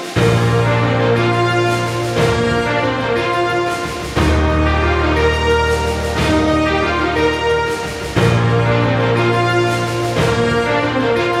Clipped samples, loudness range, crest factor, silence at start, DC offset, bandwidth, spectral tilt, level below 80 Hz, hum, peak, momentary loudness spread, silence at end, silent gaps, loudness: under 0.1%; 1 LU; 14 dB; 0 s; under 0.1%; 14 kHz; -6 dB/octave; -28 dBFS; none; -2 dBFS; 4 LU; 0 s; none; -15 LUFS